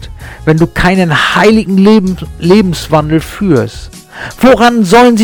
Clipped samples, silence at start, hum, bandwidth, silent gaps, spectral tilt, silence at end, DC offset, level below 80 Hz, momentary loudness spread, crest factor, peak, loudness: 0.6%; 0 s; none; 18.5 kHz; none; -6 dB/octave; 0 s; under 0.1%; -28 dBFS; 15 LU; 8 dB; 0 dBFS; -8 LUFS